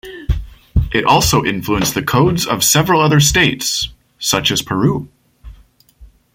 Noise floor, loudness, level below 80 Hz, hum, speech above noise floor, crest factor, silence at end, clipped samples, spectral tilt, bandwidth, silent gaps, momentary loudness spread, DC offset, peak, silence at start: -46 dBFS; -14 LUFS; -28 dBFS; none; 32 dB; 16 dB; 0.3 s; under 0.1%; -3.5 dB/octave; 16.5 kHz; none; 12 LU; under 0.1%; 0 dBFS; 0.05 s